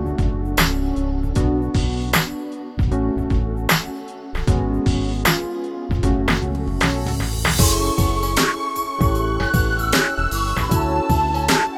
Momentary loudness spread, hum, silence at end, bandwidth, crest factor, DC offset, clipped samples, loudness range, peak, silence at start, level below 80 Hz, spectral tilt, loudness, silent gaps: 6 LU; none; 0 s; over 20 kHz; 16 dB; under 0.1%; under 0.1%; 2 LU; -4 dBFS; 0 s; -24 dBFS; -5 dB/octave; -20 LUFS; none